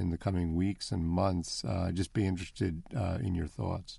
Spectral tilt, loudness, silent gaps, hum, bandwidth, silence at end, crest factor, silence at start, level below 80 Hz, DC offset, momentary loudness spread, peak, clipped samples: -6.5 dB/octave; -33 LUFS; none; none; 11.5 kHz; 0 s; 14 dB; 0 s; -48 dBFS; under 0.1%; 5 LU; -18 dBFS; under 0.1%